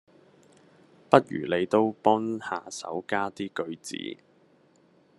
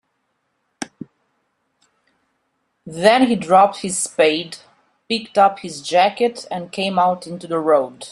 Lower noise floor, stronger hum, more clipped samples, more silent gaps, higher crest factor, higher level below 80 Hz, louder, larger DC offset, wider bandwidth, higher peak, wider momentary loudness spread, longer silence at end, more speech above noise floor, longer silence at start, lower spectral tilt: second, -62 dBFS vs -70 dBFS; neither; neither; neither; first, 28 dB vs 18 dB; second, -74 dBFS vs -64 dBFS; second, -27 LUFS vs -18 LUFS; neither; about the same, 12 kHz vs 12.5 kHz; about the same, 0 dBFS vs 0 dBFS; second, 14 LU vs 19 LU; first, 1.05 s vs 0 s; second, 35 dB vs 53 dB; first, 1.1 s vs 0.8 s; first, -5 dB/octave vs -3.5 dB/octave